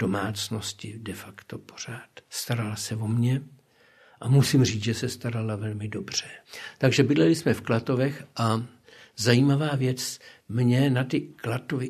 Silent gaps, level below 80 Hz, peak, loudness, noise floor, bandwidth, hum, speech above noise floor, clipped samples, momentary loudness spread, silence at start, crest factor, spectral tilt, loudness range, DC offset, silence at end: none; -62 dBFS; -4 dBFS; -26 LUFS; -58 dBFS; 14 kHz; none; 33 dB; under 0.1%; 17 LU; 0 s; 22 dB; -5.5 dB/octave; 7 LU; under 0.1%; 0 s